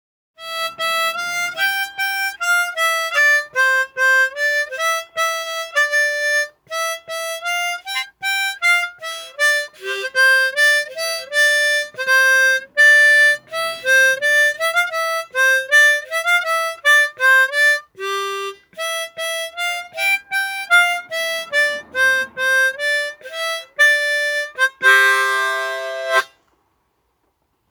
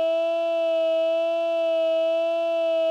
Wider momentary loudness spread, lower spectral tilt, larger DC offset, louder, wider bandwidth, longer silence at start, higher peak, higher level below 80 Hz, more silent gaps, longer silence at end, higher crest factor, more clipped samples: first, 11 LU vs 1 LU; second, 1.5 dB/octave vs -1 dB/octave; neither; first, -16 LUFS vs -23 LUFS; first, over 20 kHz vs 7.4 kHz; first, 0.4 s vs 0 s; first, -2 dBFS vs -16 dBFS; first, -70 dBFS vs under -90 dBFS; neither; first, 1.45 s vs 0 s; first, 16 dB vs 6 dB; neither